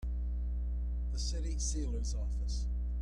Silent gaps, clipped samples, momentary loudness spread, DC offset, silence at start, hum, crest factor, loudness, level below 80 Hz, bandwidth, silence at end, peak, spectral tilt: none; under 0.1%; 2 LU; under 0.1%; 0 s; 60 Hz at -35 dBFS; 10 dB; -38 LUFS; -34 dBFS; 10 kHz; 0 s; -24 dBFS; -5 dB/octave